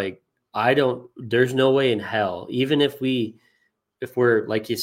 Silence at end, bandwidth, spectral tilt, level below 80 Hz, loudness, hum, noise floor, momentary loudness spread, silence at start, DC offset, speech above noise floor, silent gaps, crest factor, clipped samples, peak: 0 s; 16.5 kHz; -6 dB/octave; -66 dBFS; -22 LUFS; none; -69 dBFS; 13 LU; 0 s; under 0.1%; 48 dB; none; 18 dB; under 0.1%; -4 dBFS